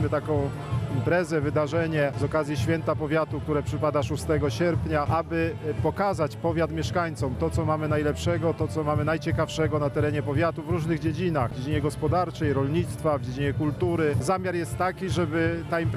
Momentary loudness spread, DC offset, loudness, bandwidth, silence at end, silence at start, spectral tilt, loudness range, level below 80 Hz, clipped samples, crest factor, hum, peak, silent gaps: 3 LU; under 0.1%; -26 LUFS; 14.5 kHz; 0 s; 0 s; -7 dB/octave; 1 LU; -44 dBFS; under 0.1%; 14 dB; none; -10 dBFS; none